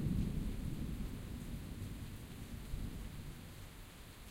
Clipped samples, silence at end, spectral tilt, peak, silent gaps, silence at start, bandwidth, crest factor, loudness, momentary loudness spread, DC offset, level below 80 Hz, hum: under 0.1%; 0 s; -6.5 dB/octave; -26 dBFS; none; 0 s; 16 kHz; 18 dB; -46 LUFS; 12 LU; under 0.1%; -46 dBFS; none